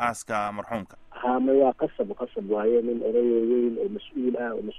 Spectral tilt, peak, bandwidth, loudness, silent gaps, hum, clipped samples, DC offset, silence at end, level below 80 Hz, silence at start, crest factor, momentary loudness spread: -6 dB/octave; -8 dBFS; 12.5 kHz; -26 LUFS; none; none; under 0.1%; under 0.1%; 0 s; -58 dBFS; 0 s; 16 dB; 11 LU